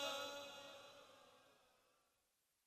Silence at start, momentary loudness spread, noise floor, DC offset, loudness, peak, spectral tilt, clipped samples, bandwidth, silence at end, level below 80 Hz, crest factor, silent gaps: 0 s; 20 LU; -85 dBFS; under 0.1%; -51 LUFS; -30 dBFS; -1 dB/octave; under 0.1%; 15.5 kHz; 0.95 s; under -90 dBFS; 24 dB; none